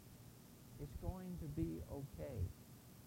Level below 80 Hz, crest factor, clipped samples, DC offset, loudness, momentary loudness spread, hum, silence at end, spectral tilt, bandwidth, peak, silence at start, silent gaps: -56 dBFS; 20 dB; under 0.1%; under 0.1%; -48 LUFS; 15 LU; none; 0 s; -7.5 dB/octave; 16 kHz; -28 dBFS; 0 s; none